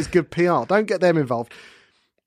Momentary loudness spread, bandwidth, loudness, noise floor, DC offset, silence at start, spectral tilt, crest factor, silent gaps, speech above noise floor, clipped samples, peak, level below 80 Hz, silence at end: 9 LU; 11.5 kHz; -20 LUFS; -59 dBFS; under 0.1%; 0 s; -6.5 dB/octave; 16 dB; none; 39 dB; under 0.1%; -4 dBFS; -52 dBFS; 0.65 s